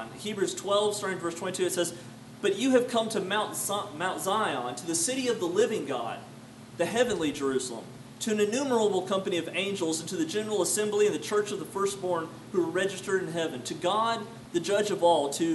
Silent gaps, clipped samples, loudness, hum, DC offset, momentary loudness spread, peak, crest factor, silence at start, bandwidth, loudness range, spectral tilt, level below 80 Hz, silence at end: none; under 0.1%; -29 LUFS; none; under 0.1%; 8 LU; -10 dBFS; 18 dB; 0 s; 12 kHz; 2 LU; -3.5 dB/octave; -68 dBFS; 0 s